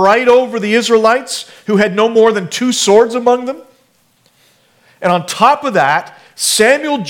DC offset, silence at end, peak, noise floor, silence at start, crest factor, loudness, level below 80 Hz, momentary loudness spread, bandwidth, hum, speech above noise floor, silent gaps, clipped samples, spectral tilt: under 0.1%; 0 s; 0 dBFS; -55 dBFS; 0 s; 12 dB; -12 LUFS; -56 dBFS; 8 LU; 17.5 kHz; none; 43 dB; none; 0.1%; -3.5 dB/octave